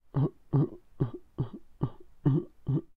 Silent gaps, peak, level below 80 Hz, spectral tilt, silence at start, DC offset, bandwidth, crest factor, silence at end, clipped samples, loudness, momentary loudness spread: none; -14 dBFS; -54 dBFS; -12 dB/octave; 0.15 s; under 0.1%; 3.9 kHz; 18 dB; 0.1 s; under 0.1%; -33 LUFS; 9 LU